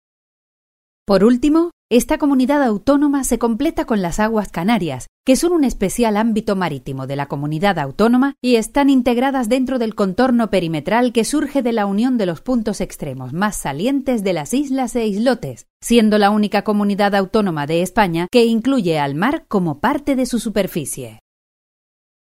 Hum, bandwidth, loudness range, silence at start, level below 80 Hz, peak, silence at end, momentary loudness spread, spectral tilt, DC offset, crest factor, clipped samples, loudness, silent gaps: none; 16 kHz; 4 LU; 1.1 s; -40 dBFS; 0 dBFS; 1.2 s; 8 LU; -5.5 dB/octave; under 0.1%; 16 dB; under 0.1%; -17 LUFS; 1.73-1.89 s, 5.08-5.24 s, 15.70-15.80 s